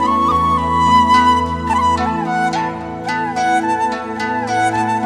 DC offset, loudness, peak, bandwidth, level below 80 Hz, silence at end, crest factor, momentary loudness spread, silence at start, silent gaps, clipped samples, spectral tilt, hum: under 0.1%; -16 LUFS; -2 dBFS; 12.5 kHz; -36 dBFS; 0 s; 14 dB; 9 LU; 0 s; none; under 0.1%; -5 dB/octave; none